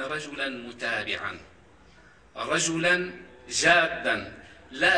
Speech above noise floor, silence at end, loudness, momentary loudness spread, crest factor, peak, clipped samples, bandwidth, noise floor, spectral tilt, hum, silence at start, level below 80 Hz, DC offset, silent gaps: 28 dB; 0 s; -26 LUFS; 22 LU; 20 dB; -6 dBFS; under 0.1%; 13.5 kHz; -55 dBFS; -2 dB/octave; none; 0 s; -60 dBFS; under 0.1%; none